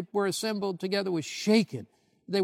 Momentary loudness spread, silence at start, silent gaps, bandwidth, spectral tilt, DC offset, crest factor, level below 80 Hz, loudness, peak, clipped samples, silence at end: 8 LU; 0 s; none; 16 kHz; -4.5 dB/octave; under 0.1%; 18 dB; -80 dBFS; -29 LUFS; -10 dBFS; under 0.1%; 0 s